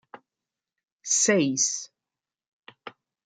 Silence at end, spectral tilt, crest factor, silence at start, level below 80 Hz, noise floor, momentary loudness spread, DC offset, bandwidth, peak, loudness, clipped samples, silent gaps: 0.35 s; -2.5 dB/octave; 22 dB; 0.15 s; -80 dBFS; under -90 dBFS; 24 LU; under 0.1%; 10.5 kHz; -8 dBFS; -23 LUFS; under 0.1%; 0.92-0.98 s, 2.47-2.63 s